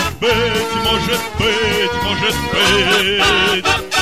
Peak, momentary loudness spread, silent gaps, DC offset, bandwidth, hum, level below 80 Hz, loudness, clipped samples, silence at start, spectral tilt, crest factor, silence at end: -2 dBFS; 5 LU; none; 0.9%; 16.5 kHz; none; -34 dBFS; -14 LUFS; under 0.1%; 0 s; -3 dB/octave; 14 dB; 0 s